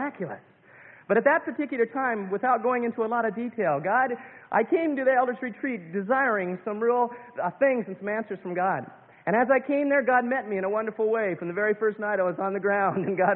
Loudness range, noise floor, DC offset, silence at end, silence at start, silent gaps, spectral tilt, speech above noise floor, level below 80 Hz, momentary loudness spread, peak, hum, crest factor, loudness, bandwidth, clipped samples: 2 LU; -51 dBFS; under 0.1%; 0 s; 0 s; none; -11 dB/octave; 26 dB; -74 dBFS; 9 LU; -8 dBFS; none; 18 dB; -26 LUFS; 4 kHz; under 0.1%